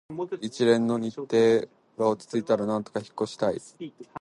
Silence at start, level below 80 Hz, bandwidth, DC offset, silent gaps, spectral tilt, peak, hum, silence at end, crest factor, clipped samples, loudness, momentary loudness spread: 0.1 s; -68 dBFS; 11.5 kHz; under 0.1%; none; -6 dB/octave; -8 dBFS; none; 0 s; 18 dB; under 0.1%; -26 LUFS; 15 LU